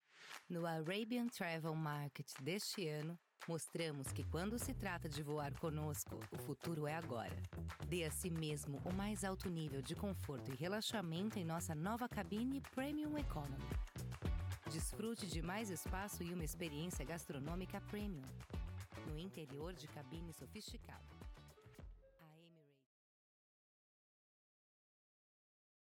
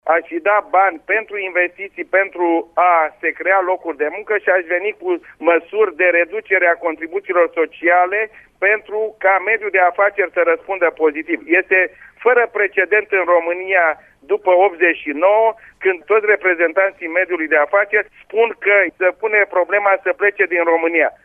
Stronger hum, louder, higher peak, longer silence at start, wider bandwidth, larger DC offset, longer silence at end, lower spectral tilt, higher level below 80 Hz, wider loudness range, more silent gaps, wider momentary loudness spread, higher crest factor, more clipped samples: neither; second, -46 LUFS vs -16 LUFS; second, -30 dBFS vs -2 dBFS; about the same, 0.15 s vs 0.05 s; first, 18.5 kHz vs 3.6 kHz; neither; first, 3.3 s vs 0.15 s; about the same, -5 dB/octave vs -6 dB/octave; first, -56 dBFS vs -64 dBFS; first, 9 LU vs 2 LU; neither; first, 10 LU vs 7 LU; about the same, 16 dB vs 14 dB; neither